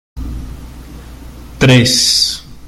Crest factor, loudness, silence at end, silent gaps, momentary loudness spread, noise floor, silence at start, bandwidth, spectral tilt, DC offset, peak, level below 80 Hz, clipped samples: 16 dB; -10 LUFS; 0 s; none; 24 LU; -32 dBFS; 0.15 s; 15.5 kHz; -3.5 dB/octave; under 0.1%; 0 dBFS; -30 dBFS; under 0.1%